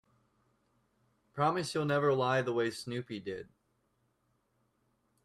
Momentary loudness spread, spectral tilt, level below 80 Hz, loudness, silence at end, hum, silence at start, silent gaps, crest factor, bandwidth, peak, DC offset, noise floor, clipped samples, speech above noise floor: 13 LU; -5.5 dB/octave; -74 dBFS; -32 LUFS; 1.8 s; none; 1.35 s; none; 20 dB; 13.5 kHz; -16 dBFS; under 0.1%; -77 dBFS; under 0.1%; 44 dB